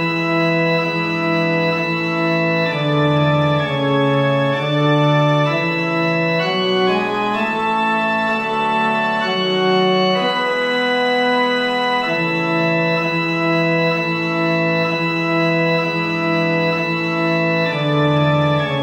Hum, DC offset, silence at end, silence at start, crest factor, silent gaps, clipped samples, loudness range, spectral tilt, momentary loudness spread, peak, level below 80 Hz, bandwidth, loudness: none; under 0.1%; 0 s; 0 s; 12 dB; none; under 0.1%; 1 LU; -6.5 dB/octave; 3 LU; -4 dBFS; -54 dBFS; 15 kHz; -17 LUFS